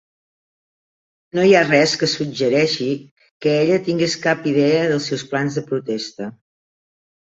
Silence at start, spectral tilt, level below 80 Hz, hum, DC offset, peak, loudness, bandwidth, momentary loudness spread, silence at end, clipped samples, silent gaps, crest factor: 1.35 s; -5 dB/octave; -62 dBFS; none; under 0.1%; 0 dBFS; -18 LUFS; 8 kHz; 12 LU; 1 s; under 0.1%; 3.11-3.16 s, 3.31-3.40 s; 20 dB